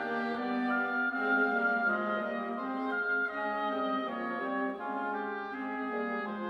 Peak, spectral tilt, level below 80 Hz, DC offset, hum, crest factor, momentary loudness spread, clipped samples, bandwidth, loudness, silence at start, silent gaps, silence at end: -18 dBFS; -6.5 dB/octave; -76 dBFS; under 0.1%; none; 16 dB; 7 LU; under 0.1%; 6.2 kHz; -32 LUFS; 0 s; none; 0 s